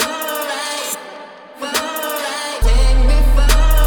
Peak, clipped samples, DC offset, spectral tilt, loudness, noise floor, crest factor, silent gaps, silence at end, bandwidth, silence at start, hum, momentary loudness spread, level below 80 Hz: -2 dBFS; under 0.1%; under 0.1%; -3.5 dB/octave; -18 LUFS; -35 dBFS; 12 dB; none; 0 s; over 20 kHz; 0 s; none; 13 LU; -16 dBFS